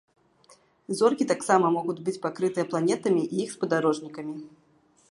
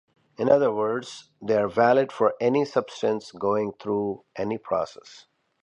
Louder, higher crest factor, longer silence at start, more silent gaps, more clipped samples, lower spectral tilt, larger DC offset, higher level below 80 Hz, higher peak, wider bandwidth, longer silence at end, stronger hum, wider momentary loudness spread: about the same, -26 LUFS vs -25 LUFS; about the same, 20 dB vs 20 dB; first, 0.9 s vs 0.4 s; neither; neither; about the same, -5.5 dB/octave vs -6 dB/octave; neither; second, -76 dBFS vs -64 dBFS; about the same, -6 dBFS vs -6 dBFS; first, 11.5 kHz vs 10 kHz; first, 0.6 s vs 0.45 s; neither; about the same, 13 LU vs 11 LU